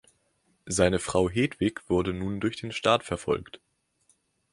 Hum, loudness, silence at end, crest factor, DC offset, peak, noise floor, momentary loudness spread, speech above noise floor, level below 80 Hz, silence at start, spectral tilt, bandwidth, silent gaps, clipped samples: none; -27 LUFS; 0.95 s; 22 dB; under 0.1%; -6 dBFS; -70 dBFS; 7 LU; 44 dB; -48 dBFS; 0.65 s; -5 dB/octave; 11.5 kHz; none; under 0.1%